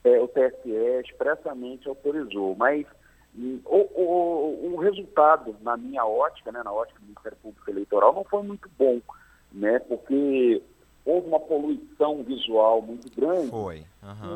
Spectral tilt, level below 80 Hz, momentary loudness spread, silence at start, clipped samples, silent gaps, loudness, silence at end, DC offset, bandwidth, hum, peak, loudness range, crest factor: -6.5 dB/octave; -60 dBFS; 16 LU; 0.05 s; under 0.1%; none; -25 LUFS; 0 s; under 0.1%; 8.4 kHz; none; -4 dBFS; 3 LU; 20 dB